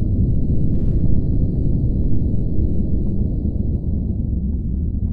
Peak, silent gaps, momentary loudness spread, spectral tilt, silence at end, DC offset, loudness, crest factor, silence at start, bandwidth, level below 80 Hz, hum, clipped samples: -4 dBFS; none; 3 LU; -14 dB/octave; 0 s; under 0.1%; -21 LUFS; 12 dB; 0 s; 1.1 kHz; -22 dBFS; none; under 0.1%